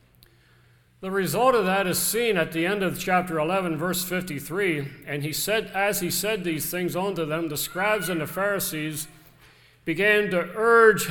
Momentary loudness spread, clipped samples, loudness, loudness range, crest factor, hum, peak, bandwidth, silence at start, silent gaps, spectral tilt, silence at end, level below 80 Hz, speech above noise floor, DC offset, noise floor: 10 LU; under 0.1%; -24 LUFS; 3 LU; 20 dB; none; -4 dBFS; 19 kHz; 1 s; none; -4 dB/octave; 0 s; -56 dBFS; 34 dB; under 0.1%; -58 dBFS